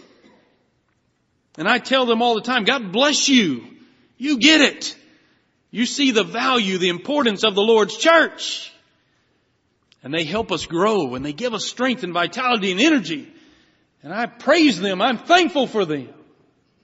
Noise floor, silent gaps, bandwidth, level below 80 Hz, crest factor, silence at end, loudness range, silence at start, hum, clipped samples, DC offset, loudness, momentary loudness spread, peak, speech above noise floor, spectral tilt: -67 dBFS; none; 8 kHz; -60 dBFS; 20 dB; 0.7 s; 5 LU; 1.6 s; none; under 0.1%; under 0.1%; -18 LUFS; 12 LU; 0 dBFS; 48 dB; -1.5 dB/octave